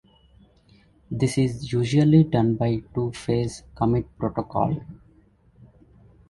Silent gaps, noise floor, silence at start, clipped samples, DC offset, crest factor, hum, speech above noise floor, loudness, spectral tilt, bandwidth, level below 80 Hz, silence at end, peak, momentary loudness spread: none; -57 dBFS; 1.1 s; under 0.1%; under 0.1%; 20 dB; none; 35 dB; -23 LUFS; -7.5 dB/octave; 11.5 kHz; -48 dBFS; 1.35 s; -6 dBFS; 11 LU